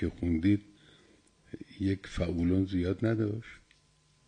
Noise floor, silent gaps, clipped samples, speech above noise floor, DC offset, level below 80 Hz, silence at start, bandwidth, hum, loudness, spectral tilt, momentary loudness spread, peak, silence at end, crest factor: -67 dBFS; none; under 0.1%; 36 dB; under 0.1%; -52 dBFS; 0 s; 9.8 kHz; none; -31 LUFS; -8 dB/octave; 19 LU; -16 dBFS; 0.7 s; 16 dB